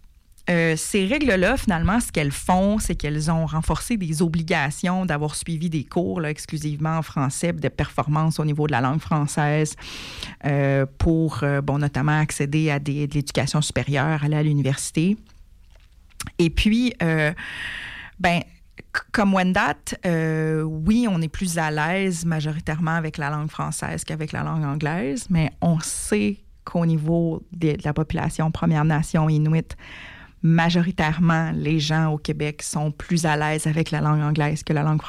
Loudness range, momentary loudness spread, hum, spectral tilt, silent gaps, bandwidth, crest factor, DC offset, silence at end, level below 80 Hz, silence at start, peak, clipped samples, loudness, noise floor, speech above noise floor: 3 LU; 7 LU; none; -5.5 dB/octave; none; 14.5 kHz; 14 dB; under 0.1%; 0 s; -40 dBFS; 0.45 s; -10 dBFS; under 0.1%; -22 LUFS; -50 dBFS; 28 dB